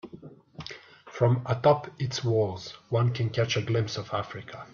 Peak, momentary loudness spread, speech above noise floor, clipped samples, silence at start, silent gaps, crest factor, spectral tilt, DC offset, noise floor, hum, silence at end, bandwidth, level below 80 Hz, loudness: -10 dBFS; 20 LU; 21 dB; under 0.1%; 0.05 s; none; 18 dB; -6 dB/octave; under 0.1%; -48 dBFS; none; 0.05 s; 7.2 kHz; -62 dBFS; -27 LUFS